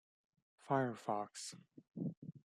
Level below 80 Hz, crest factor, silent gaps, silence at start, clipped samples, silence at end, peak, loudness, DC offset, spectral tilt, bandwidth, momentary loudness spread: -86 dBFS; 22 dB; 2.17-2.22 s; 0.65 s; under 0.1%; 0.15 s; -22 dBFS; -42 LUFS; under 0.1%; -5.5 dB/octave; 14.5 kHz; 18 LU